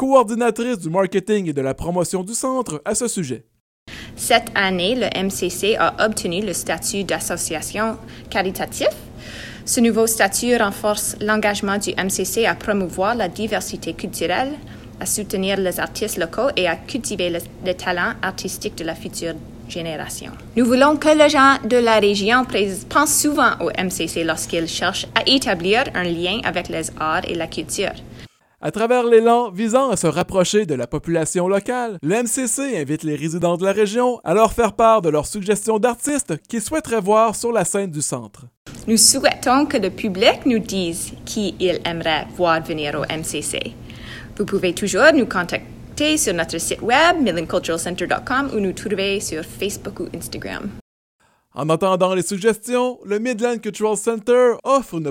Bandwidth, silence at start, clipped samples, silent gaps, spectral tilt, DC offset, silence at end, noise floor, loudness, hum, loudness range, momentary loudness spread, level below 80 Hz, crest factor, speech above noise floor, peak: 17 kHz; 0 s; under 0.1%; 3.60-3.86 s, 38.57-38.65 s, 50.81-51.19 s; -3.5 dB/octave; under 0.1%; 0 s; -43 dBFS; -19 LUFS; none; 6 LU; 13 LU; -46 dBFS; 20 dB; 23 dB; 0 dBFS